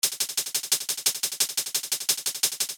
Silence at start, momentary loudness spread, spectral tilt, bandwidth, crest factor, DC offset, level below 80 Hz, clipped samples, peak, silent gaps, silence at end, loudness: 0.05 s; 3 LU; 2.5 dB/octave; 17.5 kHz; 22 dB; under 0.1%; -80 dBFS; under 0.1%; -6 dBFS; none; 0 s; -25 LUFS